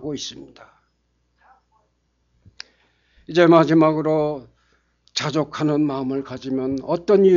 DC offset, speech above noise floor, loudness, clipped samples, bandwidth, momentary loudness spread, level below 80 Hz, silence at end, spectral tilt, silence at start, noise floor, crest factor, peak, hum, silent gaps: under 0.1%; 49 dB; -20 LUFS; under 0.1%; 7.4 kHz; 25 LU; -58 dBFS; 0 s; -6.5 dB/octave; 0 s; -68 dBFS; 20 dB; -2 dBFS; 60 Hz at -60 dBFS; none